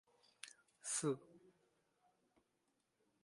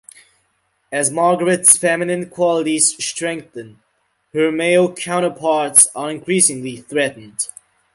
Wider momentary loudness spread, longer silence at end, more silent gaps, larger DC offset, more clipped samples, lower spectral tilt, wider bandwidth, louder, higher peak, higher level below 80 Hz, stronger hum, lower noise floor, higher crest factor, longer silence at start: about the same, 17 LU vs 15 LU; first, 1.85 s vs 0.5 s; neither; neither; neither; about the same, -3.5 dB/octave vs -2.5 dB/octave; second, 11.5 kHz vs 16 kHz; second, -43 LUFS vs -16 LUFS; second, -28 dBFS vs 0 dBFS; second, under -90 dBFS vs -64 dBFS; neither; first, -85 dBFS vs -65 dBFS; first, 24 dB vs 18 dB; second, 0.45 s vs 0.9 s